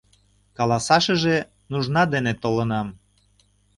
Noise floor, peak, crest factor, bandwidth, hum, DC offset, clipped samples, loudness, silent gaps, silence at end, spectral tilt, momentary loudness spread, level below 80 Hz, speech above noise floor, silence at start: -61 dBFS; -2 dBFS; 22 dB; 11.5 kHz; 50 Hz at -50 dBFS; under 0.1%; under 0.1%; -22 LUFS; none; 0.85 s; -5 dB/octave; 10 LU; -52 dBFS; 40 dB; 0.6 s